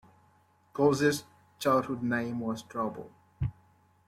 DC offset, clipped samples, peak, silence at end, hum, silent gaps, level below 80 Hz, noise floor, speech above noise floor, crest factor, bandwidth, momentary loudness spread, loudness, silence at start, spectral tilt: under 0.1%; under 0.1%; -14 dBFS; 0.55 s; none; none; -56 dBFS; -65 dBFS; 36 dB; 18 dB; 16 kHz; 12 LU; -30 LUFS; 0.75 s; -5.5 dB/octave